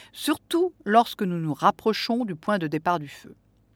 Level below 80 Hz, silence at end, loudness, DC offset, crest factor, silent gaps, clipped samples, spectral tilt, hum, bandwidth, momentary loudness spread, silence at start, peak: -66 dBFS; 0.45 s; -25 LUFS; under 0.1%; 20 dB; none; under 0.1%; -5.5 dB/octave; none; 18 kHz; 7 LU; 0.15 s; -4 dBFS